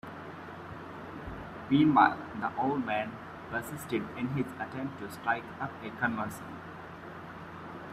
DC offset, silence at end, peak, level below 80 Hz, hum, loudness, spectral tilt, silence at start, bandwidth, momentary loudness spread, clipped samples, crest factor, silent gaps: under 0.1%; 0 s; -8 dBFS; -60 dBFS; none; -31 LUFS; -6.5 dB/octave; 0.05 s; 14.5 kHz; 18 LU; under 0.1%; 24 dB; none